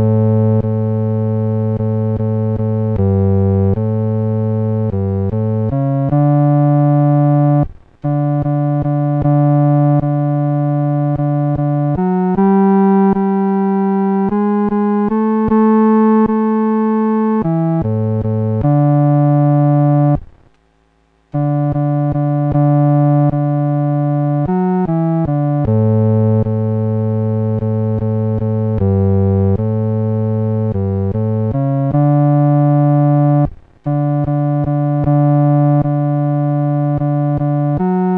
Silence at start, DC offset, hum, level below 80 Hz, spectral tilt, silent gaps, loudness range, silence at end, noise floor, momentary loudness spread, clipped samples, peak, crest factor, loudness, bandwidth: 0 s; under 0.1%; none; -40 dBFS; -13 dB/octave; none; 2 LU; 0 s; -56 dBFS; 5 LU; under 0.1%; -4 dBFS; 10 dB; -14 LUFS; 3.2 kHz